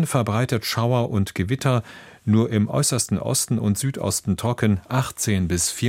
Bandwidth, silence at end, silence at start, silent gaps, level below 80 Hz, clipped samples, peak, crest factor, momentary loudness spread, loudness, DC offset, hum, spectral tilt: 16.5 kHz; 0 s; 0 s; none; -48 dBFS; under 0.1%; -6 dBFS; 16 dB; 4 LU; -22 LUFS; under 0.1%; none; -5 dB/octave